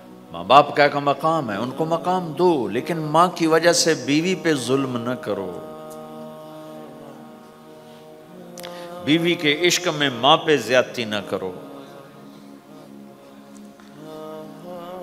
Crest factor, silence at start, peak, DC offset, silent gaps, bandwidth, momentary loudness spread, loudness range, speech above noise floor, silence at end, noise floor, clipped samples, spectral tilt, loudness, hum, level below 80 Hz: 22 dB; 0 s; 0 dBFS; under 0.1%; none; 16 kHz; 23 LU; 19 LU; 24 dB; 0 s; -44 dBFS; under 0.1%; -4 dB/octave; -19 LUFS; none; -68 dBFS